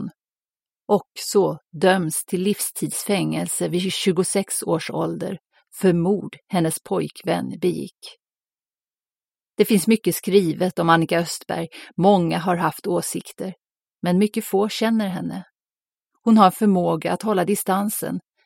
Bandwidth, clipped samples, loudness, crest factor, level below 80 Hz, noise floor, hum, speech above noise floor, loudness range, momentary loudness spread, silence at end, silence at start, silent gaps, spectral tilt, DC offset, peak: 16.5 kHz; under 0.1%; -21 LUFS; 20 dB; -64 dBFS; under -90 dBFS; none; over 69 dB; 4 LU; 12 LU; 0.25 s; 0 s; 0.50-0.54 s; -5 dB/octave; under 0.1%; -2 dBFS